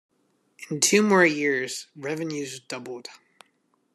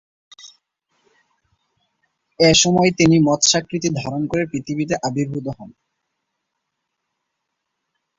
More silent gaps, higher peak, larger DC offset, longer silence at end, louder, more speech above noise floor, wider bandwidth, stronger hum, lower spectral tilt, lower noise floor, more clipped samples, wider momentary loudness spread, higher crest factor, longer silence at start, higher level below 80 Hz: neither; about the same, -4 dBFS vs -2 dBFS; neither; second, 0.8 s vs 2.5 s; second, -23 LUFS vs -17 LUFS; second, 45 dB vs 60 dB; first, 14 kHz vs 8 kHz; neither; about the same, -3 dB/octave vs -4 dB/octave; second, -69 dBFS vs -77 dBFS; neither; first, 20 LU vs 12 LU; about the same, 22 dB vs 20 dB; first, 0.6 s vs 0.45 s; second, -76 dBFS vs -52 dBFS